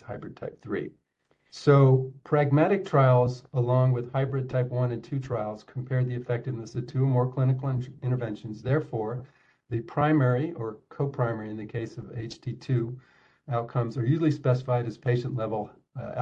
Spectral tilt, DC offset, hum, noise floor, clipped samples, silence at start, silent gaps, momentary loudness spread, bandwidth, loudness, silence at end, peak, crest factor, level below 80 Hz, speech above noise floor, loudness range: -9 dB/octave; under 0.1%; none; -69 dBFS; under 0.1%; 0.05 s; none; 15 LU; 7.2 kHz; -27 LUFS; 0 s; -8 dBFS; 20 dB; -60 dBFS; 43 dB; 7 LU